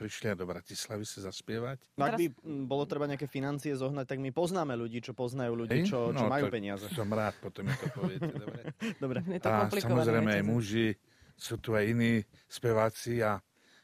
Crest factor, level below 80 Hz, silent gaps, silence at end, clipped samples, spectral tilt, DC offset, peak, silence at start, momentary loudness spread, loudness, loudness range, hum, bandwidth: 20 dB; -64 dBFS; none; 0.45 s; under 0.1%; -6 dB/octave; under 0.1%; -14 dBFS; 0 s; 10 LU; -33 LUFS; 5 LU; none; 15.5 kHz